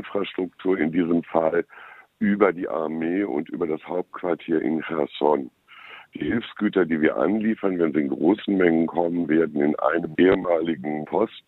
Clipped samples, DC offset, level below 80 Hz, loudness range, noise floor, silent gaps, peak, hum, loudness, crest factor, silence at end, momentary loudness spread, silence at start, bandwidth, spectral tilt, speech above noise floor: under 0.1%; under 0.1%; -60 dBFS; 4 LU; -45 dBFS; none; -4 dBFS; none; -23 LUFS; 18 dB; 0.1 s; 8 LU; 0 s; 4.1 kHz; -9 dB/octave; 23 dB